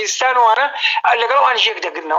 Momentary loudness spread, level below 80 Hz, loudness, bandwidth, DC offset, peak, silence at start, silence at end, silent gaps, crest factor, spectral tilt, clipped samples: 3 LU; -84 dBFS; -14 LUFS; 13 kHz; under 0.1%; -2 dBFS; 0 s; 0 s; none; 14 dB; 2.5 dB/octave; under 0.1%